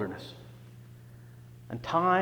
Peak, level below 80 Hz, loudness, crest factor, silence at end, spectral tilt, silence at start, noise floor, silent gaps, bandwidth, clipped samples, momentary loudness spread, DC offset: -12 dBFS; -64 dBFS; -31 LUFS; 20 dB; 0 s; -6.5 dB/octave; 0 s; -50 dBFS; none; over 20 kHz; under 0.1%; 23 LU; under 0.1%